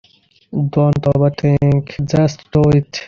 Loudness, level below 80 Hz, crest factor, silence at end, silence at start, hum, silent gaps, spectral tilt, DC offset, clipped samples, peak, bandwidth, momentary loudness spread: -15 LUFS; -40 dBFS; 12 dB; 0 s; 0.5 s; none; none; -8 dB/octave; under 0.1%; under 0.1%; -2 dBFS; 7 kHz; 5 LU